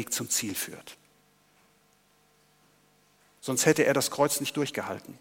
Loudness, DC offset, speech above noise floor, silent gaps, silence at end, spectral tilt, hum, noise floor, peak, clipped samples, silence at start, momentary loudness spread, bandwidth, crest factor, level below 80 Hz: -27 LUFS; under 0.1%; 37 dB; none; 0.05 s; -3 dB/octave; 50 Hz at -65 dBFS; -65 dBFS; -6 dBFS; under 0.1%; 0 s; 16 LU; 17 kHz; 24 dB; -76 dBFS